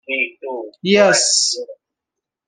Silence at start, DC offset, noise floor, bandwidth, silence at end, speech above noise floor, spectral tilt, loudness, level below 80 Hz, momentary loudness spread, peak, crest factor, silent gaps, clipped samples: 0.1 s; under 0.1%; -83 dBFS; 11 kHz; 0.75 s; 67 dB; -2 dB/octave; -15 LUFS; -64 dBFS; 17 LU; -2 dBFS; 16 dB; none; under 0.1%